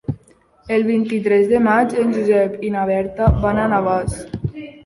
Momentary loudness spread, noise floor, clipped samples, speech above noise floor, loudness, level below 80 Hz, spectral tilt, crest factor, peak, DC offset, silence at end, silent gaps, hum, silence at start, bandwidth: 13 LU; -52 dBFS; under 0.1%; 35 dB; -18 LUFS; -32 dBFS; -7.5 dB/octave; 16 dB; -2 dBFS; under 0.1%; 0.15 s; none; none; 0.1 s; 11.5 kHz